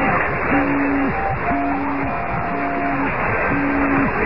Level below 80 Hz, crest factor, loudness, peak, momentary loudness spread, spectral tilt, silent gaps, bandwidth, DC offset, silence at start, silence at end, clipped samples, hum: -36 dBFS; 14 dB; -19 LUFS; -6 dBFS; 4 LU; -10.5 dB/octave; none; 5.6 kHz; 3%; 0 s; 0 s; under 0.1%; none